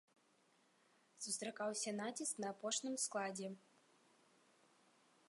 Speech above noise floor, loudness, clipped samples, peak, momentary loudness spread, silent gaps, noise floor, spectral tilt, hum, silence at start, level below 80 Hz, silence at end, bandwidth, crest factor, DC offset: 31 dB; -43 LUFS; under 0.1%; -26 dBFS; 9 LU; none; -76 dBFS; -2 dB/octave; none; 1.15 s; under -90 dBFS; 1.7 s; 11.5 kHz; 22 dB; under 0.1%